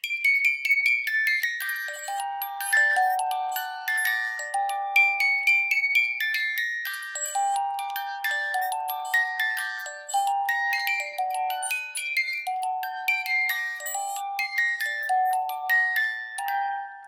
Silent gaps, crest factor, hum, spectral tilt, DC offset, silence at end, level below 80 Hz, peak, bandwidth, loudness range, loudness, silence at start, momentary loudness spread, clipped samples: none; 18 dB; none; 5.5 dB/octave; under 0.1%; 0 s; under -90 dBFS; -8 dBFS; 17 kHz; 4 LU; -24 LUFS; 0.05 s; 10 LU; under 0.1%